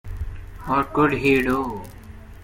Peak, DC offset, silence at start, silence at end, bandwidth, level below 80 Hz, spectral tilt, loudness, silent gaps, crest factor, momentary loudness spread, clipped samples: -6 dBFS; under 0.1%; 0.05 s; 0 s; 16.5 kHz; -38 dBFS; -6.5 dB/octave; -21 LUFS; none; 18 dB; 18 LU; under 0.1%